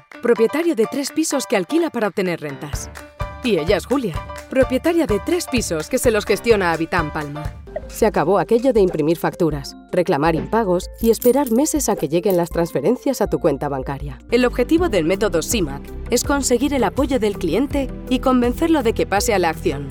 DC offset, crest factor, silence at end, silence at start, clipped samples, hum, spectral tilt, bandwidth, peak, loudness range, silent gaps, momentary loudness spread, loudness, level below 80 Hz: under 0.1%; 18 dB; 0 s; 0.15 s; under 0.1%; none; -5 dB/octave; 17.5 kHz; -2 dBFS; 3 LU; none; 10 LU; -19 LUFS; -36 dBFS